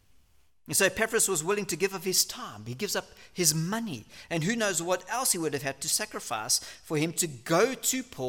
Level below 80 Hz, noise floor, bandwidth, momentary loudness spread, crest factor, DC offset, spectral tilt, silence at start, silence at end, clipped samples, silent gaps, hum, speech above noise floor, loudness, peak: -64 dBFS; -66 dBFS; 17.5 kHz; 9 LU; 24 dB; under 0.1%; -2.5 dB/octave; 0.7 s; 0 s; under 0.1%; none; none; 36 dB; -28 LUFS; -6 dBFS